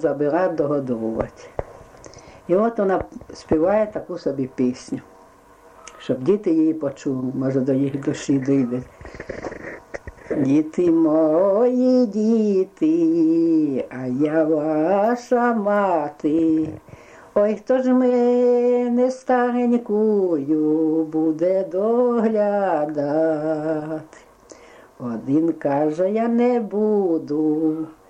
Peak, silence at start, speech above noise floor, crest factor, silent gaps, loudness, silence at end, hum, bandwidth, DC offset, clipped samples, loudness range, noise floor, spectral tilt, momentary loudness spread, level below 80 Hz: -6 dBFS; 0 s; 30 dB; 14 dB; none; -20 LUFS; 0.15 s; none; 8.8 kHz; under 0.1%; under 0.1%; 5 LU; -49 dBFS; -8 dB/octave; 14 LU; -52 dBFS